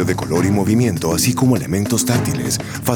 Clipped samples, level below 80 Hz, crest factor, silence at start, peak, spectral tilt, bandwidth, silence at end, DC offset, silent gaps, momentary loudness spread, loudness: under 0.1%; -46 dBFS; 16 dB; 0 s; 0 dBFS; -5 dB/octave; over 20 kHz; 0 s; under 0.1%; none; 4 LU; -17 LUFS